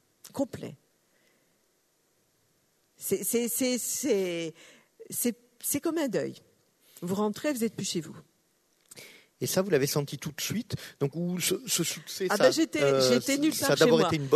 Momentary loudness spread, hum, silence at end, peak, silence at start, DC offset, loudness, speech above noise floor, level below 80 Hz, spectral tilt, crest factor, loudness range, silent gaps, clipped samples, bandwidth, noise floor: 15 LU; none; 0 s; -8 dBFS; 0.25 s; under 0.1%; -28 LUFS; 43 dB; -70 dBFS; -4 dB/octave; 22 dB; 8 LU; none; under 0.1%; 13.5 kHz; -71 dBFS